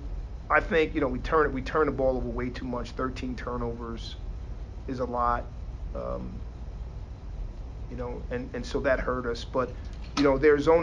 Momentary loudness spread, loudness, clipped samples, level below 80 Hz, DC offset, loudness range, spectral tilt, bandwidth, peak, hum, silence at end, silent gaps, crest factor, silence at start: 16 LU; -28 LUFS; under 0.1%; -38 dBFS; under 0.1%; 7 LU; -6.5 dB/octave; 9.2 kHz; -8 dBFS; none; 0 s; none; 20 dB; 0 s